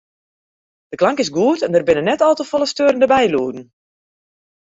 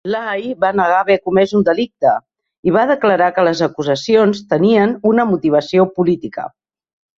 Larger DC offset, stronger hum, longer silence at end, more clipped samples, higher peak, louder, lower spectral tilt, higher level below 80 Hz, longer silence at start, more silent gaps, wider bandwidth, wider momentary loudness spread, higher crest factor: neither; neither; first, 1.05 s vs 0.7 s; neither; about the same, -2 dBFS vs -2 dBFS; about the same, -16 LUFS vs -15 LUFS; second, -4.5 dB/octave vs -6.5 dB/octave; about the same, -56 dBFS vs -54 dBFS; first, 0.9 s vs 0.05 s; second, none vs 2.58-2.63 s; about the same, 8 kHz vs 7.6 kHz; about the same, 8 LU vs 8 LU; about the same, 16 dB vs 14 dB